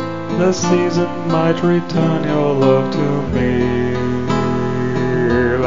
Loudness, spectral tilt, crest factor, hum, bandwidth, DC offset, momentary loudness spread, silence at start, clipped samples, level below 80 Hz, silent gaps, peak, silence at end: -16 LUFS; -6.5 dB/octave; 16 dB; none; 7.6 kHz; 3%; 4 LU; 0 s; under 0.1%; -38 dBFS; none; 0 dBFS; 0 s